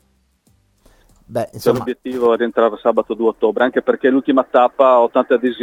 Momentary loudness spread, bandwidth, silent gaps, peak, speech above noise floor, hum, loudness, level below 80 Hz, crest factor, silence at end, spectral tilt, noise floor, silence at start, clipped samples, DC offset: 8 LU; 17 kHz; none; 0 dBFS; 44 dB; none; -16 LUFS; -56 dBFS; 16 dB; 0 s; -6 dB/octave; -59 dBFS; 1.3 s; under 0.1%; under 0.1%